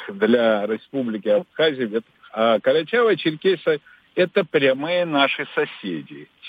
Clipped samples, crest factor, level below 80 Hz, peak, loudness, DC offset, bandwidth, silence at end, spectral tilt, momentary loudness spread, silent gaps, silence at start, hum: under 0.1%; 16 dB; -76 dBFS; -4 dBFS; -21 LUFS; under 0.1%; 5 kHz; 0 s; -7 dB/octave; 11 LU; none; 0 s; none